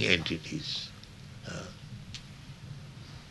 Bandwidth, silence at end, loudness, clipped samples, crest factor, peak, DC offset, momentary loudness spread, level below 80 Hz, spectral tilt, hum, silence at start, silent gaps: 12 kHz; 0 s; -36 LUFS; under 0.1%; 30 dB; -6 dBFS; under 0.1%; 17 LU; -56 dBFS; -4 dB/octave; none; 0 s; none